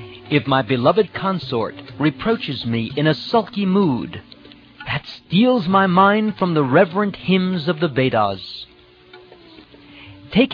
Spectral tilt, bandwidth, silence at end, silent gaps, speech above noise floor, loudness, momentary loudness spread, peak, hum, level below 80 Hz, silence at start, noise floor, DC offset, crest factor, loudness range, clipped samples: -8.5 dB/octave; 5.4 kHz; 0 s; none; 28 dB; -19 LUFS; 11 LU; -2 dBFS; none; -52 dBFS; 0 s; -46 dBFS; under 0.1%; 18 dB; 4 LU; under 0.1%